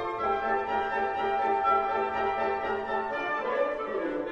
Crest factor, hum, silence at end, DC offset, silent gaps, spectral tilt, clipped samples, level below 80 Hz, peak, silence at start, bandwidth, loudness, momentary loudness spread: 14 dB; none; 0 s; under 0.1%; none; -5.5 dB/octave; under 0.1%; -56 dBFS; -14 dBFS; 0 s; 7.6 kHz; -28 LUFS; 5 LU